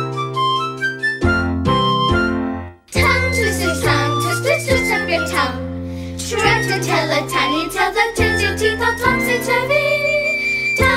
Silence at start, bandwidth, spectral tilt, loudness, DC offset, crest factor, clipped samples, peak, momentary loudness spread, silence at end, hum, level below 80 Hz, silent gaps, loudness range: 0 s; 16 kHz; -4.5 dB/octave; -17 LUFS; under 0.1%; 16 dB; under 0.1%; -2 dBFS; 6 LU; 0 s; none; -34 dBFS; none; 2 LU